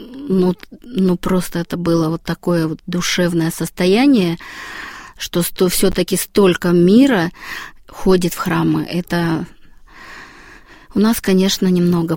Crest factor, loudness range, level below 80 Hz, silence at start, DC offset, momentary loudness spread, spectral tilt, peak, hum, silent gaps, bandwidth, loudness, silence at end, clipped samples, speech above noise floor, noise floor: 16 dB; 5 LU; -40 dBFS; 0 s; under 0.1%; 16 LU; -5.5 dB/octave; 0 dBFS; none; none; 17 kHz; -16 LUFS; 0 s; under 0.1%; 26 dB; -41 dBFS